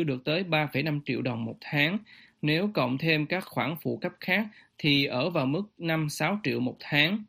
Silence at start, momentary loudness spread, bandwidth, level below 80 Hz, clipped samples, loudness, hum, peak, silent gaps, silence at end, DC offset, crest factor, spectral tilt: 0 s; 8 LU; 15.5 kHz; -66 dBFS; under 0.1%; -28 LUFS; none; -6 dBFS; none; 0.05 s; under 0.1%; 22 dB; -5.5 dB/octave